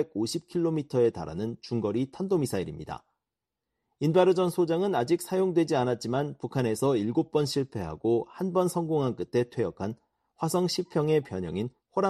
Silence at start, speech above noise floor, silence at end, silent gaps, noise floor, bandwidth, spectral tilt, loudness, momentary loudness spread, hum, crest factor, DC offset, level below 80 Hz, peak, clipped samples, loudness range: 0 s; 60 dB; 0 s; none; -88 dBFS; 13.5 kHz; -6.5 dB/octave; -28 LUFS; 9 LU; none; 18 dB; under 0.1%; -60 dBFS; -10 dBFS; under 0.1%; 4 LU